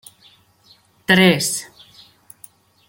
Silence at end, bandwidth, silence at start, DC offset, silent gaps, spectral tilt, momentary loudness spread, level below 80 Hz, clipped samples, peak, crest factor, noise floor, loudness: 1.25 s; 17 kHz; 1.1 s; under 0.1%; none; -4 dB/octave; 19 LU; -60 dBFS; under 0.1%; -2 dBFS; 20 dB; -54 dBFS; -16 LUFS